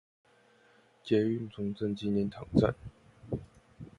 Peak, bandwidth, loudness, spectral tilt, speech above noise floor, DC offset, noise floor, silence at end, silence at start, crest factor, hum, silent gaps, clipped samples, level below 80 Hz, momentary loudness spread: -12 dBFS; 9.8 kHz; -32 LUFS; -8.5 dB/octave; 34 dB; under 0.1%; -64 dBFS; 0.15 s; 1.05 s; 20 dB; none; none; under 0.1%; -54 dBFS; 19 LU